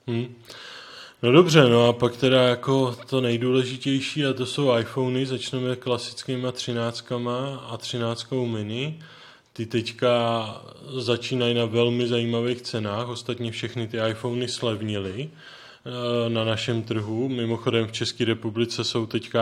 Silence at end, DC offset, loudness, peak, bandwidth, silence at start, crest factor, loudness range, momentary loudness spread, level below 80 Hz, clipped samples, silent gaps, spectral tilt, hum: 0 s; under 0.1%; -24 LUFS; 0 dBFS; 14 kHz; 0.05 s; 24 dB; 8 LU; 14 LU; -66 dBFS; under 0.1%; none; -5.5 dB/octave; none